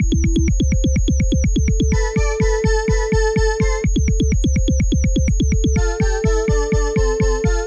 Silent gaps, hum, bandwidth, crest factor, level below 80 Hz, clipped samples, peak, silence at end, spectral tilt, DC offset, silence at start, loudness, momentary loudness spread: none; none; 8.4 kHz; 10 dB; -18 dBFS; under 0.1%; -6 dBFS; 0 s; -6 dB/octave; under 0.1%; 0 s; -18 LUFS; 1 LU